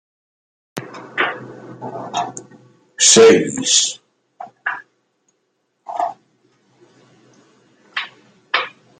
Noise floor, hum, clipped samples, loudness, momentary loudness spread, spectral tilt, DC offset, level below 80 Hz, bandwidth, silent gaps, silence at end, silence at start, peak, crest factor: -69 dBFS; none; under 0.1%; -16 LUFS; 24 LU; -1.5 dB/octave; under 0.1%; -64 dBFS; 11.5 kHz; none; 0.3 s; 0.75 s; 0 dBFS; 20 dB